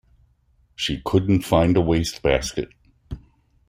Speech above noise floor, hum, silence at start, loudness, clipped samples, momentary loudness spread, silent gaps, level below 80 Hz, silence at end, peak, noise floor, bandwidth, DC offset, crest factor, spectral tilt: 41 dB; none; 0.8 s; -21 LUFS; under 0.1%; 21 LU; none; -40 dBFS; 0.5 s; -2 dBFS; -61 dBFS; 16 kHz; under 0.1%; 20 dB; -6 dB/octave